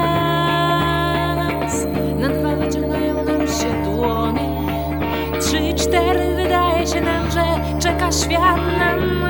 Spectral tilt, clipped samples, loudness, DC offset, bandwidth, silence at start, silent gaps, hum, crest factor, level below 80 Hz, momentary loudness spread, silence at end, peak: -5 dB/octave; under 0.1%; -18 LUFS; under 0.1%; 19 kHz; 0 s; none; none; 16 dB; -30 dBFS; 5 LU; 0 s; -2 dBFS